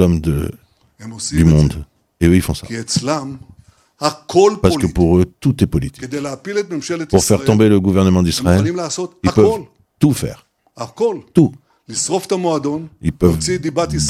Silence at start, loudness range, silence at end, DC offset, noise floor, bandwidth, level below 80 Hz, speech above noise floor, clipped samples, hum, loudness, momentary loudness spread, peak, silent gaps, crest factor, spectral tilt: 0 s; 4 LU; 0 s; under 0.1%; -48 dBFS; 15.5 kHz; -34 dBFS; 33 dB; under 0.1%; none; -16 LUFS; 12 LU; 0 dBFS; none; 16 dB; -6 dB/octave